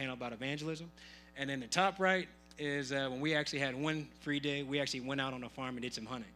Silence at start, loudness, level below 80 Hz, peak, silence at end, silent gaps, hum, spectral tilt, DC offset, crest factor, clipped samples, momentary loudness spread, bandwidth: 0 s; -37 LUFS; -66 dBFS; -14 dBFS; 0 s; none; none; -4 dB/octave; under 0.1%; 24 dB; under 0.1%; 10 LU; 14.5 kHz